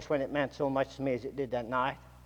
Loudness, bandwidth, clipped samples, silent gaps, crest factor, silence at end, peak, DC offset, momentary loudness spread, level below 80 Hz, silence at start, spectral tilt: -33 LUFS; 17 kHz; under 0.1%; none; 18 dB; 0 s; -16 dBFS; under 0.1%; 4 LU; -58 dBFS; 0 s; -6.5 dB/octave